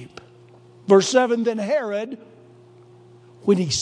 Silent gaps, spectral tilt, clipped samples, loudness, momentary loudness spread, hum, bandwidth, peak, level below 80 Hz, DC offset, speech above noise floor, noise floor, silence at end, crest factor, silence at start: none; -4.5 dB/octave; under 0.1%; -20 LUFS; 21 LU; none; 10.5 kHz; -2 dBFS; -62 dBFS; under 0.1%; 30 dB; -49 dBFS; 0 s; 20 dB; 0 s